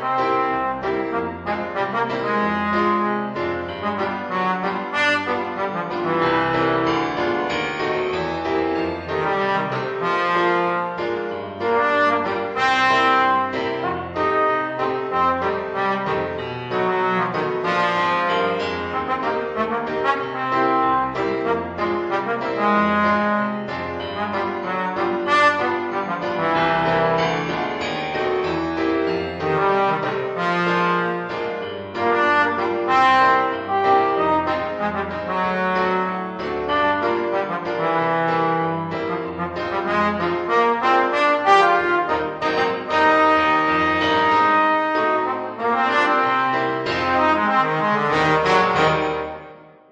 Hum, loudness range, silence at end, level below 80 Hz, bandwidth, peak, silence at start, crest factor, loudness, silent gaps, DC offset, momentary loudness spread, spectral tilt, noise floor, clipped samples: none; 4 LU; 0.25 s; -52 dBFS; 9.4 kHz; -2 dBFS; 0 s; 18 dB; -20 LUFS; none; under 0.1%; 8 LU; -5.5 dB/octave; -42 dBFS; under 0.1%